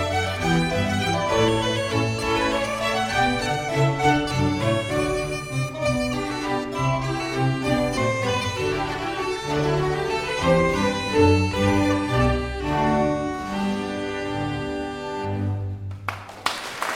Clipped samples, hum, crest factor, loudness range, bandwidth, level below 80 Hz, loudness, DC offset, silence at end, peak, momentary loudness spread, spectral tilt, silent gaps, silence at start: under 0.1%; none; 18 dB; 4 LU; 16.5 kHz; -40 dBFS; -23 LUFS; under 0.1%; 0 s; -6 dBFS; 8 LU; -5.5 dB/octave; none; 0 s